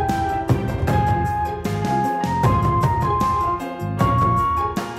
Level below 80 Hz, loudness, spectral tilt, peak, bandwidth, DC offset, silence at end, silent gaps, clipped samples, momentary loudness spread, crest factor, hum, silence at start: -34 dBFS; -20 LUFS; -7 dB/octave; -6 dBFS; 16 kHz; under 0.1%; 0 s; none; under 0.1%; 6 LU; 14 dB; none; 0 s